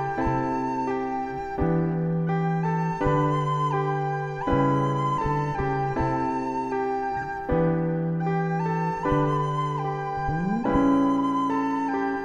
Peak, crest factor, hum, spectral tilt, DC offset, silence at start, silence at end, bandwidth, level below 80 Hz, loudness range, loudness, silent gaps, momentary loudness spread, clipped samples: -8 dBFS; 16 dB; none; -8.5 dB/octave; 0.2%; 0 s; 0 s; 7.6 kHz; -42 dBFS; 2 LU; -25 LUFS; none; 5 LU; under 0.1%